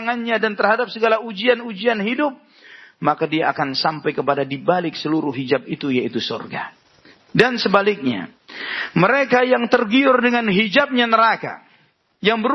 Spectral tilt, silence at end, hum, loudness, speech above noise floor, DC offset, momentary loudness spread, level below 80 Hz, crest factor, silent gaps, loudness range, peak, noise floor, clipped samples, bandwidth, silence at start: -6 dB/octave; 0 s; none; -18 LUFS; 40 dB; under 0.1%; 10 LU; -64 dBFS; 20 dB; none; 5 LU; 0 dBFS; -58 dBFS; under 0.1%; 6.8 kHz; 0 s